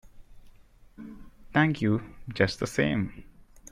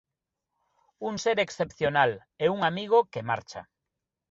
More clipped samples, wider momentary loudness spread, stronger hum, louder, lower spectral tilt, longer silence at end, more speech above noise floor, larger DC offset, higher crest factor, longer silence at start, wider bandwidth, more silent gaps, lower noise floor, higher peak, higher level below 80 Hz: neither; first, 22 LU vs 11 LU; neither; about the same, -27 LUFS vs -27 LUFS; first, -6 dB/octave vs -4.5 dB/octave; second, 0.05 s vs 0.7 s; second, 27 dB vs 59 dB; neither; about the same, 22 dB vs 20 dB; second, 0.15 s vs 1 s; first, 15 kHz vs 7.8 kHz; neither; second, -53 dBFS vs -86 dBFS; about the same, -8 dBFS vs -8 dBFS; first, -52 dBFS vs -64 dBFS